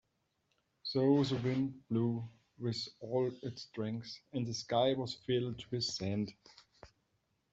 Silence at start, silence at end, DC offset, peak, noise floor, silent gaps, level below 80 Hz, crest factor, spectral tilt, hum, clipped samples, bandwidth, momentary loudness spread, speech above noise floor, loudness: 0.85 s; 0.65 s; under 0.1%; -18 dBFS; -80 dBFS; none; -72 dBFS; 20 dB; -6 dB/octave; none; under 0.1%; 8 kHz; 12 LU; 45 dB; -36 LUFS